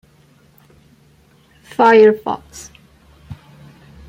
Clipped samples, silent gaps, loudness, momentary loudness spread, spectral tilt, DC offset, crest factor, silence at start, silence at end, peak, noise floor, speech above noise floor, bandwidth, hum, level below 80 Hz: under 0.1%; none; -13 LUFS; 29 LU; -5.5 dB/octave; under 0.1%; 18 dB; 1.8 s; 0.75 s; -2 dBFS; -51 dBFS; 39 dB; 11 kHz; none; -52 dBFS